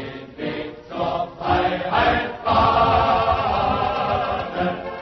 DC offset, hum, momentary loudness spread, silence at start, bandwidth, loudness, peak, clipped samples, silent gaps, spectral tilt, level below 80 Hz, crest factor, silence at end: under 0.1%; none; 12 LU; 0 s; 6.2 kHz; -21 LUFS; -6 dBFS; under 0.1%; none; -7 dB/octave; -38 dBFS; 16 dB; 0 s